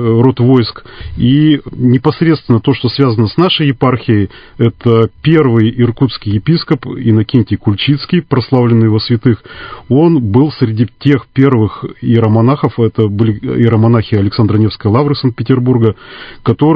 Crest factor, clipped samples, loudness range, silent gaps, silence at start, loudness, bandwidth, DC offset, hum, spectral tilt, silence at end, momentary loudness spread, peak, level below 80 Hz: 10 dB; 0.2%; 1 LU; none; 0 s; -11 LUFS; 5.2 kHz; under 0.1%; none; -10 dB/octave; 0 s; 6 LU; 0 dBFS; -36 dBFS